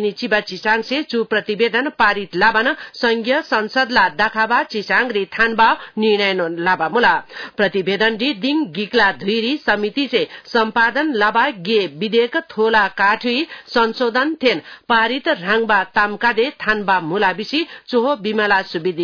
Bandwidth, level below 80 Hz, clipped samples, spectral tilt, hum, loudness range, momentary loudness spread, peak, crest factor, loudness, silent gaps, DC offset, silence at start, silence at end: 5.4 kHz; -52 dBFS; under 0.1%; -5 dB/octave; none; 1 LU; 5 LU; -4 dBFS; 14 dB; -17 LUFS; none; under 0.1%; 0 s; 0 s